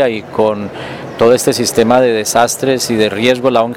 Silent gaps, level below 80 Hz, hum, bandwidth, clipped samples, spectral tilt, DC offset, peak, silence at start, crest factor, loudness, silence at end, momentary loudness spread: none; -50 dBFS; none; 17 kHz; under 0.1%; -4 dB/octave; under 0.1%; 0 dBFS; 0 s; 12 dB; -12 LUFS; 0 s; 10 LU